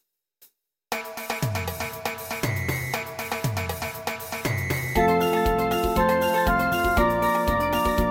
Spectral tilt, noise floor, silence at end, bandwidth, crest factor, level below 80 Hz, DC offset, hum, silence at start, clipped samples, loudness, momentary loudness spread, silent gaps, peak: -5 dB/octave; -59 dBFS; 0 s; 17 kHz; 16 dB; -36 dBFS; under 0.1%; none; 0.9 s; under 0.1%; -24 LUFS; 9 LU; none; -8 dBFS